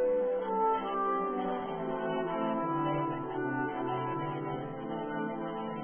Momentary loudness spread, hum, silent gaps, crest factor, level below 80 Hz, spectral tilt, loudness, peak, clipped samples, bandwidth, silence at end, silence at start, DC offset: 7 LU; none; none; 14 dB; -66 dBFS; -5.5 dB/octave; -33 LUFS; -18 dBFS; under 0.1%; 3.5 kHz; 0 s; 0 s; under 0.1%